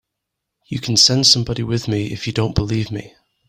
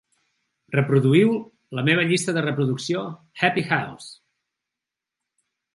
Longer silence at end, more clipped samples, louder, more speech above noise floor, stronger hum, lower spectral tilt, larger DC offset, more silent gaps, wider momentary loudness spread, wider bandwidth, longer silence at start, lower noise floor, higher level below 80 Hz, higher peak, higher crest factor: second, 0.4 s vs 1.6 s; neither; first, -16 LUFS vs -22 LUFS; second, 61 dB vs 65 dB; neither; second, -3.5 dB/octave vs -5.5 dB/octave; neither; neither; about the same, 16 LU vs 16 LU; first, 16 kHz vs 11.5 kHz; about the same, 0.7 s vs 0.7 s; second, -79 dBFS vs -87 dBFS; first, -42 dBFS vs -68 dBFS; about the same, 0 dBFS vs -2 dBFS; about the same, 20 dB vs 20 dB